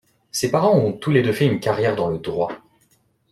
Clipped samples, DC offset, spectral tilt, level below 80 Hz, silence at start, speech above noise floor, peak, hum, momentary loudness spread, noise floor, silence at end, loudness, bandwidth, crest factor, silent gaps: under 0.1%; under 0.1%; -6 dB/octave; -56 dBFS; 0.35 s; 43 dB; -4 dBFS; none; 9 LU; -62 dBFS; 0.75 s; -20 LUFS; 14.5 kHz; 18 dB; none